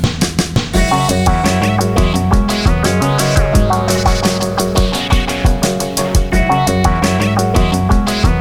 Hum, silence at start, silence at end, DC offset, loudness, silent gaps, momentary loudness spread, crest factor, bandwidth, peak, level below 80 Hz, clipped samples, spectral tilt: none; 0 s; 0 s; under 0.1%; -14 LUFS; none; 3 LU; 12 dB; 18 kHz; 0 dBFS; -18 dBFS; under 0.1%; -5 dB/octave